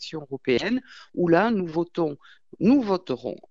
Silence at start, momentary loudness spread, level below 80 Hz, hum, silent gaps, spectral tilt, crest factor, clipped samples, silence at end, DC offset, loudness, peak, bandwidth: 0 s; 11 LU; -60 dBFS; none; none; -7 dB/octave; 18 dB; under 0.1%; 0.15 s; 0.1%; -24 LUFS; -6 dBFS; 7.6 kHz